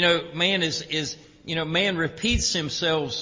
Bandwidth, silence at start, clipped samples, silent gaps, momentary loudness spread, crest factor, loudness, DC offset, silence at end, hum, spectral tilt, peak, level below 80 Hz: 7.6 kHz; 0 s; under 0.1%; none; 8 LU; 16 dB; -24 LUFS; under 0.1%; 0 s; none; -3 dB/octave; -8 dBFS; -40 dBFS